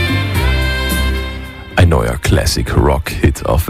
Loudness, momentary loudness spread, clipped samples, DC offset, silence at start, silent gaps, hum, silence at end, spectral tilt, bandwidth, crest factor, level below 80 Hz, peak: -15 LUFS; 7 LU; under 0.1%; under 0.1%; 0 s; none; none; 0 s; -5.5 dB/octave; 16 kHz; 12 dB; -20 dBFS; -2 dBFS